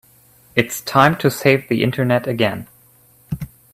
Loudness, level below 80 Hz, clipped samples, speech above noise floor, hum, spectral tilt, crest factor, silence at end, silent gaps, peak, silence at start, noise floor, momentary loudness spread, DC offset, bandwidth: -17 LUFS; -50 dBFS; under 0.1%; 35 dB; none; -5.5 dB/octave; 18 dB; 0.25 s; none; 0 dBFS; 0.55 s; -52 dBFS; 15 LU; under 0.1%; 16 kHz